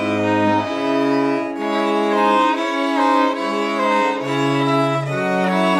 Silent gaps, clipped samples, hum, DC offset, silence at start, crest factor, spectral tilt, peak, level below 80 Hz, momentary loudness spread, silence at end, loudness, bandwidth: none; under 0.1%; none; under 0.1%; 0 s; 14 dB; -6 dB/octave; -4 dBFS; -68 dBFS; 4 LU; 0 s; -18 LUFS; 13.5 kHz